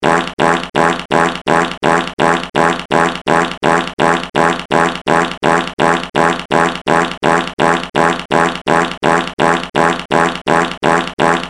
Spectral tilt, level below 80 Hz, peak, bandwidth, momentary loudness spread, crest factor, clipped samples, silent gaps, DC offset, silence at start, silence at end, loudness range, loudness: -4.5 dB/octave; -42 dBFS; 0 dBFS; 14 kHz; 1 LU; 14 dB; under 0.1%; none; 0.2%; 0 s; 0 s; 0 LU; -14 LUFS